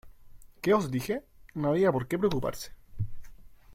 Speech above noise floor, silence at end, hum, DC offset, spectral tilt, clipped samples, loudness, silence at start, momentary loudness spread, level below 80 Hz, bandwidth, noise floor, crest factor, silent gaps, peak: 22 dB; 0 s; none; under 0.1%; -6.5 dB/octave; under 0.1%; -30 LUFS; 0.05 s; 14 LU; -50 dBFS; 16.5 kHz; -50 dBFS; 18 dB; none; -12 dBFS